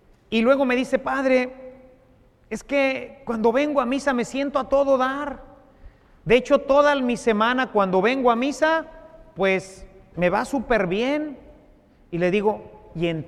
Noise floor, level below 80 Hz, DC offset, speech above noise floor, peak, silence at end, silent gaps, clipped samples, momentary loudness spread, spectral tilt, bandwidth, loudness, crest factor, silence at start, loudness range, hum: -55 dBFS; -48 dBFS; under 0.1%; 34 dB; -4 dBFS; 0 s; none; under 0.1%; 15 LU; -5.5 dB/octave; 12.5 kHz; -22 LUFS; 18 dB; 0.3 s; 5 LU; none